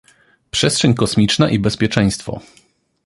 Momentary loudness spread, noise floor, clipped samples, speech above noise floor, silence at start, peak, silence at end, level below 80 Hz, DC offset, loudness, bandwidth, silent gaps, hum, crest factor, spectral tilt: 11 LU; -46 dBFS; under 0.1%; 30 dB; 0.55 s; 0 dBFS; 0.65 s; -42 dBFS; under 0.1%; -16 LUFS; 11.5 kHz; none; none; 18 dB; -4.5 dB/octave